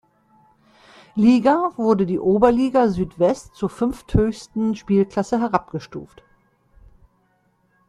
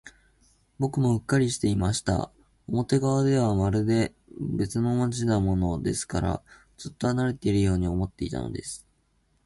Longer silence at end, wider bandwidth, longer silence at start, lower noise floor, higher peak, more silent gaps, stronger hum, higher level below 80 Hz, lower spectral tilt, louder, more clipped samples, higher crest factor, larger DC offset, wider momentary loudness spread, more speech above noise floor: first, 1.85 s vs 0.7 s; about the same, 11.5 kHz vs 11.5 kHz; first, 1.15 s vs 0.05 s; second, -64 dBFS vs -68 dBFS; first, -2 dBFS vs -10 dBFS; neither; neither; about the same, -40 dBFS vs -42 dBFS; about the same, -7.5 dB/octave vs -6.5 dB/octave; first, -20 LUFS vs -26 LUFS; neither; about the same, 18 dB vs 16 dB; neither; about the same, 12 LU vs 11 LU; about the same, 45 dB vs 43 dB